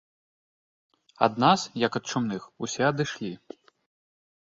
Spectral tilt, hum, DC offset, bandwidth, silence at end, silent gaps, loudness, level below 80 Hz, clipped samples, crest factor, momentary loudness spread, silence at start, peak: -4.5 dB/octave; none; under 0.1%; 7.8 kHz; 1.05 s; none; -26 LUFS; -66 dBFS; under 0.1%; 24 dB; 13 LU; 1.2 s; -4 dBFS